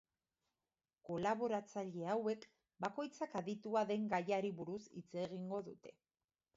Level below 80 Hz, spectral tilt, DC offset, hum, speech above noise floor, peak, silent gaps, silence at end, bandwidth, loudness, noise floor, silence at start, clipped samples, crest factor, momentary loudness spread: -82 dBFS; -5.5 dB/octave; under 0.1%; none; over 48 dB; -24 dBFS; none; 0.65 s; 7.6 kHz; -42 LUFS; under -90 dBFS; 1.05 s; under 0.1%; 20 dB; 11 LU